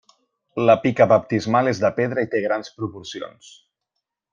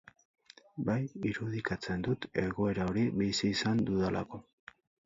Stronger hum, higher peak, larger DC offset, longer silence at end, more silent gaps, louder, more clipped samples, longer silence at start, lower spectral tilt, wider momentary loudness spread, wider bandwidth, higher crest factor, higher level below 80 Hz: neither; first, -2 dBFS vs -16 dBFS; neither; first, 1.05 s vs 0.65 s; neither; first, -20 LUFS vs -33 LUFS; neither; second, 0.55 s vs 0.75 s; about the same, -6.5 dB/octave vs -6 dB/octave; first, 17 LU vs 8 LU; about the same, 7.4 kHz vs 7.6 kHz; about the same, 20 dB vs 18 dB; second, -62 dBFS vs -56 dBFS